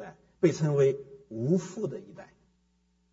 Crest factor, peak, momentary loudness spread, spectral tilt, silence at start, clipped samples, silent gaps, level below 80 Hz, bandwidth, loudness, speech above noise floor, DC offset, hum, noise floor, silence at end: 20 dB; -10 dBFS; 18 LU; -7.5 dB/octave; 0 s; under 0.1%; none; -68 dBFS; 7.8 kHz; -29 LUFS; 43 dB; under 0.1%; none; -71 dBFS; 0.9 s